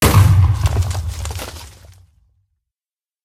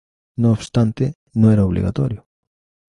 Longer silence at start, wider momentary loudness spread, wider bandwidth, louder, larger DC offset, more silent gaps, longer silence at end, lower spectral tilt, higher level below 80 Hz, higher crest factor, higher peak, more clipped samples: second, 0 s vs 0.4 s; first, 19 LU vs 10 LU; first, 16 kHz vs 11 kHz; about the same, -16 LUFS vs -18 LUFS; neither; second, none vs 1.15-1.26 s; first, 1.55 s vs 0.7 s; second, -5.5 dB/octave vs -8.5 dB/octave; first, -26 dBFS vs -38 dBFS; about the same, 16 dB vs 16 dB; about the same, 0 dBFS vs -2 dBFS; neither